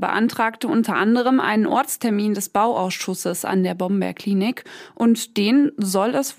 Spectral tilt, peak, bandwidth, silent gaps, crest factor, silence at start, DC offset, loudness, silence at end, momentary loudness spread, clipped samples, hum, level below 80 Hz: -5 dB/octave; -6 dBFS; 16 kHz; none; 14 dB; 0 s; under 0.1%; -20 LUFS; 0.05 s; 7 LU; under 0.1%; none; -70 dBFS